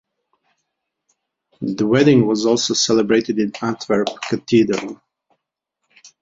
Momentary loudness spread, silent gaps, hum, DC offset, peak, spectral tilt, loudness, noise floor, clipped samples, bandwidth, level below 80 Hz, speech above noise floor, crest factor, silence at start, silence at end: 12 LU; none; none; under 0.1%; -2 dBFS; -4.5 dB/octave; -17 LUFS; -77 dBFS; under 0.1%; 7.8 kHz; -58 dBFS; 60 dB; 18 dB; 1.6 s; 1.25 s